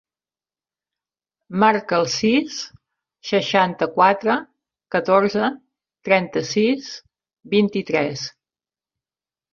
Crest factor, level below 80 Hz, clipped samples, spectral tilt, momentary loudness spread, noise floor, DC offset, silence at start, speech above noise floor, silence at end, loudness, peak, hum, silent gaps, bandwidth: 20 dB; -64 dBFS; under 0.1%; -4.5 dB/octave; 15 LU; under -90 dBFS; under 0.1%; 1.5 s; over 71 dB; 1.25 s; -20 LUFS; -2 dBFS; none; none; 7.4 kHz